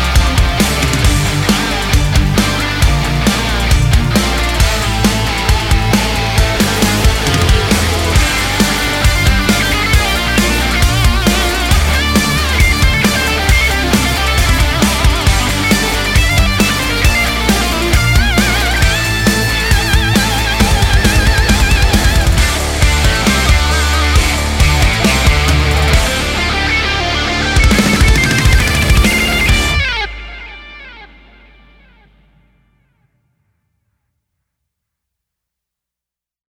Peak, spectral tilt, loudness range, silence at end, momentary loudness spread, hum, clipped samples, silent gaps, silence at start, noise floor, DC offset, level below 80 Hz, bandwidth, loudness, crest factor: 0 dBFS; -4 dB/octave; 1 LU; 5.55 s; 3 LU; none; under 0.1%; none; 0 s; -86 dBFS; under 0.1%; -16 dBFS; 17 kHz; -12 LUFS; 12 dB